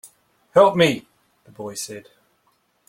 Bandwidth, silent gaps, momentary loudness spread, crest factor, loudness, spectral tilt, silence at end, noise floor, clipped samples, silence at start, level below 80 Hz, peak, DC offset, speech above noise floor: 16.5 kHz; none; 20 LU; 20 dB; -19 LUFS; -4.5 dB/octave; 0.9 s; -66 dBFS; under 0.1%; 0.55 s; -64 dBFS; -2 dBFS; under 0.1%; 47 dB